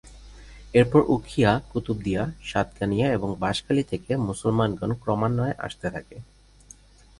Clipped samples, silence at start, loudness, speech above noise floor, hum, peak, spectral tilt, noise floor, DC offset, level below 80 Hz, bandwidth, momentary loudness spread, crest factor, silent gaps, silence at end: under 0.1%; 0.05 s; -25 LUFS; 27 dB; 50 Hz at -45 dBFS; -6 dBFS; -7 dB/octave; -51 dBFS; under 0.1%; -46 dBFS; 11.5 kHz; 10 LU; 20 dB; none; 0.95 s